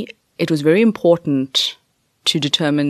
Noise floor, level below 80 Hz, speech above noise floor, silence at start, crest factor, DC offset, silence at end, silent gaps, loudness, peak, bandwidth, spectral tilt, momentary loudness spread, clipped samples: -62 dBFS; -64 dBFS; 46 dB; 0 s; 16 dB; under 0.1%; 0 s; none; -17 LUFS; -2 dBFS; 13 kHz; -5 dB/octave; 8 LU; under 0.1%